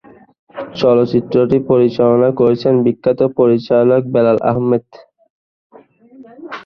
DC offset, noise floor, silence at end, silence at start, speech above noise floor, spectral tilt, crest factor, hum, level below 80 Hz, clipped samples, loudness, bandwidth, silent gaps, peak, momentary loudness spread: under 0.1%; -43 dBFS; 0.05 s; 0.55 s; 30 dB; -9 dB/octave; 14 dB; none; -52 dBFS; under 0.1%; -13 LUFS; 6.4 kHz; 5.30-5.70 s; -2 dBFS; 6 LU